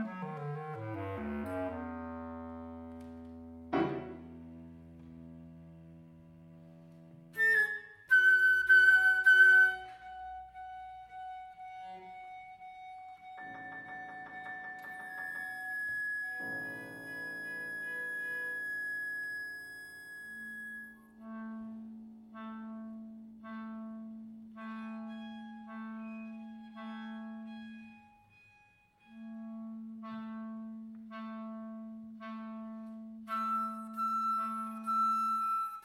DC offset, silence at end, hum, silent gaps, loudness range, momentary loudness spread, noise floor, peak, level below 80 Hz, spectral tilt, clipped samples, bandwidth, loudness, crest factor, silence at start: under 0.1%; 0 s; none; none; 22 LU; 23 LU; -66 dBFS; -14 dBFS; -68 dBFS; -4.5 dB/octave; under 0.1%; 16 kHz; -31 LUFS; 22 dB; 0 s